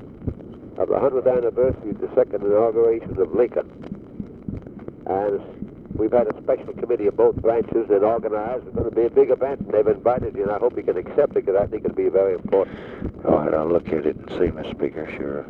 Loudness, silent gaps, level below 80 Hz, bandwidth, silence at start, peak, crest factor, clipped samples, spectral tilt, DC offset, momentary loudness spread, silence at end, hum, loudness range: -21 LUFS; none; -44 dBFS; 4.3 kHz; 0 s; -4 dBFS; 18 dB; under 0.1%; -10 dB/octave; under 0.1%; 15 LU; 0 s; none; 4 LU